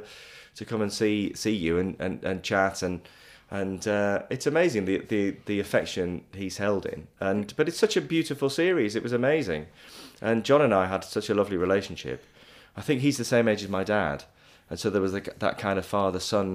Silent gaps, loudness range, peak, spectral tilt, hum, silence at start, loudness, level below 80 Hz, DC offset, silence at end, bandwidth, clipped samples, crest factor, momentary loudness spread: none; 3 LU; -8 dBFS; -5 dB/octave; none; 0 s; -27 LUFS; -58 dBFS; under 0.1%; 0 s; 15.5 kHz; under 0.1%; 18 dB; 13 LU